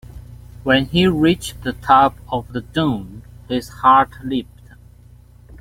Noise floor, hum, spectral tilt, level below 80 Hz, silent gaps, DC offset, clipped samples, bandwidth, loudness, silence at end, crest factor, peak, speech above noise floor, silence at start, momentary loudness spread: -45 dBFS; 60 Hz at -40 dBFS; -6 dB/octave; -42 dBFS; none; under 0.1%; under 0.1%; 16.5 kHz; -18 LUFS; 1.15 s; 18 dB; -2 dBFS; 28 dB; 0.15 s; 13 LU